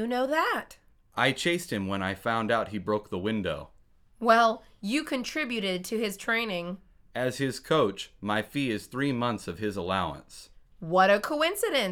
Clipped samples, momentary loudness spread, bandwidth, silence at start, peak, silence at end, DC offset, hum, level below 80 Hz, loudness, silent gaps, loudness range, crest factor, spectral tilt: under 0.1%; 13 LU; 19 kHz; 0 s; -8 dBFS; 0 s; under 0.1%; none; -58 dBFS; -28 LUFS; none; 2 LU; 20 dB; -4.5 dB/octave